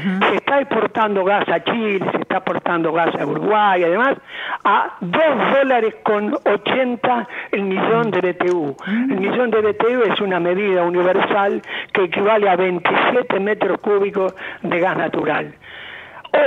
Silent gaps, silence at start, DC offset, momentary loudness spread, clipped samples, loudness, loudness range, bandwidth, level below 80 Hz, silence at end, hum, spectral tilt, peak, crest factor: none; 0 s; under 0.1%; 7 LU; under 0.1%; -18 LUFS; 2 LU; 7.2 kHz; -64 dBFS; 0 s; none; -7 dB/octave; -4 dBFS; 14 dB